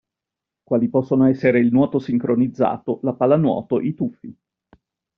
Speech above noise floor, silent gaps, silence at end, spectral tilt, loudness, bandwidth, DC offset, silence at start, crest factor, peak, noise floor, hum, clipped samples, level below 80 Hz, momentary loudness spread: 67 dB; none; 0.85 s; -8.5 dB/octave; -19 LUFS; 5.4 kHz; under 0.1%; 0.7 s; 16 dB; -4 dBFS; -86 dBFS; none; under 0.1%; -58 dBFS; 8 LU